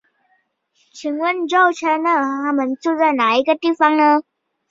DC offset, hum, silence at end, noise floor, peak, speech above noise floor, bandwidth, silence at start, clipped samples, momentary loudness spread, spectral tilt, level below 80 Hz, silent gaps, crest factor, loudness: under 0.1%; none; 0.5 s; -64 dBFS; -2 dBFS; 48 dB; 7.8 kHz; 0.95 s; under 0.1%; 6 LU; -3 dB/octave; -70 dBFS; none; 16 dB; -17 LUFS